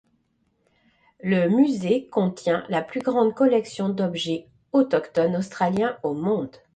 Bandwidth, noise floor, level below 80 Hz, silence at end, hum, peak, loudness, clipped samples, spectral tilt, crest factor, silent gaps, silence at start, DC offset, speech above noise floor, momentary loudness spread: 9.2 kHz; -69 dBFS; -64 dBFS; 0.25 s; none; -8 dBFS; -23 LUFS; under 0.1%; -7 dB/octave; 16 dB; none; 1.25 s; under 0.1%; 46 dB; 8 LU